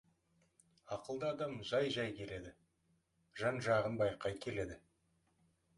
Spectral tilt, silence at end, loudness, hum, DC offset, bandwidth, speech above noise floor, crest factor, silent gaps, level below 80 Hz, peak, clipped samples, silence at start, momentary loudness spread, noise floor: -5.5 dB/octave; 1 s; -39 LUFS; none; under 0.1%; 11.5 kHz; 40 dB; 20 dB; none; -66 dBFS; -20 dBFS; under 0.1%; 0.85 s; 14 LU; -79 dBFS